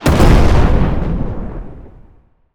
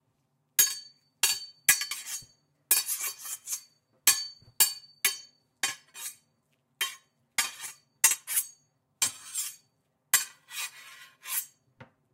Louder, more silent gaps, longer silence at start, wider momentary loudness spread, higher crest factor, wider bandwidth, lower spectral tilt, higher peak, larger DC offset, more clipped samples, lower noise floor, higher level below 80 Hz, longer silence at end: first, -14 LUFS vs -28 LUFS; neither; second, 0 s vs 0.6 s; first, 20 LU vs 16 LU; second, 12 dB vs 28 dB; first, 18.5 kHz vs 16 kHz; first, -7 dB/octave vs 3 dB/octave; first, 0 dBFS vs -6 dBFS; neither; neither; second, -47 dBFS vs -75 dBFS; first, -16 dBFS vs -80 dBFS; first, 0.65 s vs 0.3 s